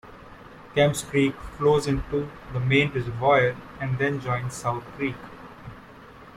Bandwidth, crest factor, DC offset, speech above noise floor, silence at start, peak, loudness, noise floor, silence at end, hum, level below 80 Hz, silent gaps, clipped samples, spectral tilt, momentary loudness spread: 15.5 kHz; 18 dB; under 0.1%; 22 dB; 0.05 s; -8 dBFS; -25 LUFS; -46 dBFS; 0 s; none; -46 dBFS; none; under 0.1%; -5.5 dB/octave; 22 LU